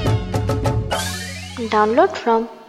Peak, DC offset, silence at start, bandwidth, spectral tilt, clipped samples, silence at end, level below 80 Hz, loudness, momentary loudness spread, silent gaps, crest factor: -2 dBFS; under 0.1%; 0 s; 15 kHz; -5.5 dB/octave; under 0.1%; 0 s; -34 dBFS; -20 LUFS; 11 LU; none; 18 dB